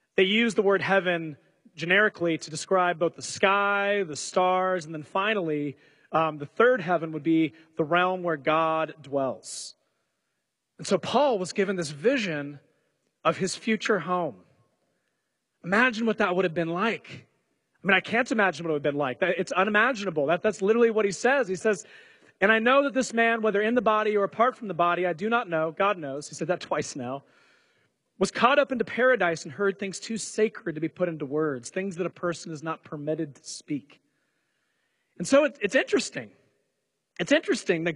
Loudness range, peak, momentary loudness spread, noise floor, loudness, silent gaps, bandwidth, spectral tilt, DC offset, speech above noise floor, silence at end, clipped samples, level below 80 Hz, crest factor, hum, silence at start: 6 LU; -4 dBFS; 12 LU; -80 dBFS; -26 LUFS; none; 11.5 kHz; -4.5 dB/octave; under 0.1%; 55 dB; 0 s; under 0.1%; -70 dBFS; 22 dB; none; 0.2 s